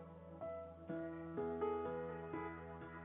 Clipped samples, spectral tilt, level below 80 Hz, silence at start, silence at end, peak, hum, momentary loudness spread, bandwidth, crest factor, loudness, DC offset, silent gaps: under 0.1%; -4 dB/octave; -72 dBFS; 0 s; 0 s; -30 dBFS; none; 10 LU; 3.8 kHz; 16 dB; -46 LUFS; under 0.1%; none